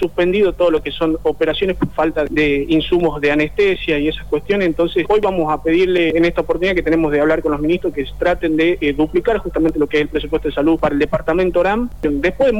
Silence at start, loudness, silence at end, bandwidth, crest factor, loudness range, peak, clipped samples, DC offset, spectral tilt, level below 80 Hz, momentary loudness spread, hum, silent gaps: 0 s; -16 LUFS; 0 s; 19.5 kHz; 10 dB; 1 LU; -6 dBFS; under 0.1%; 2%; -7 dB/octave; -34 dBFS; 4 LU; none; none